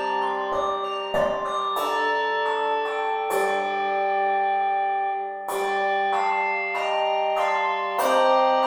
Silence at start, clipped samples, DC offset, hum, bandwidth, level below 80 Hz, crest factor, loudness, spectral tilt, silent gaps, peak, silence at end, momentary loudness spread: 0 s; under 0.1%; under 0.1%; none; 19.5 kHz; -60 dBFS; 14 dB; -24 LUFS; -2.5 dB/octave; none; -8 dBFS; 0 s; 4 LU